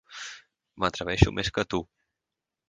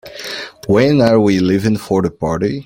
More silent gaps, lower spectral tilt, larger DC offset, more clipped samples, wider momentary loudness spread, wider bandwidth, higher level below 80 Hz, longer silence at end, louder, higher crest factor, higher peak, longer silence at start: neither; about the same, -5.5 dB/octave vs -6.5 dB/octave; neither; neither; first, 19 LU vs 14 LU; second, 9.6 kHz vs 16.5 kHz; about the same, -40 dBFS vs -44 dBFS; first, 0.85 s vs 0.05 s; second, -27 LUFS vs -14 LUFS; first, 26 dB vs 14 dB; about the same, -2 dBFS vs -2 dBFS; about the same, 0.1 s vs 0.05 s